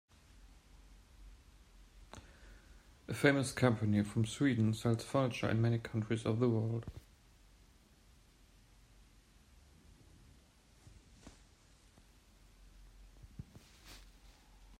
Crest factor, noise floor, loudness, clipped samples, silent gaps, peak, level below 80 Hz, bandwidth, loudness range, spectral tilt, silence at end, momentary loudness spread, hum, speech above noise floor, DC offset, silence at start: 24 dB; -65 dBFS; -34 LUFS; under 0.1%; none; -14 dBFS; -62 dBFS; 15.5 kHz; 8 LU; -6.5 dB/octave; 0.05 s; 25 LU; none; 32 dB; under 0.1%; 0.45 s